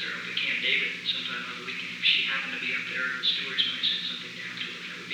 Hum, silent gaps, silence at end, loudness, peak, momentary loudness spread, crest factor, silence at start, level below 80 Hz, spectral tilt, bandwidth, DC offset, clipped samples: none; none; 0 s; -27 LUFS; -10 dBFS; 10 LU; 20 dB; 0 s; -78 dBFS; -1.5 dB/octave; over 20 kHz; under 0.1%; under 0.1%